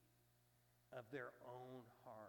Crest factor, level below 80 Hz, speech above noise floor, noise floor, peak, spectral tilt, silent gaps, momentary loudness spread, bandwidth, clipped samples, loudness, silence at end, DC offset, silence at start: 20 dB; -90 dBFS; 21 dB; -78 dBFS; -38 dBFS; -6.5 dB/octave; none; 7 LU; 18 kHz; under 0.1%; -57 LUFS; 0 s; under 0.1%; 0 s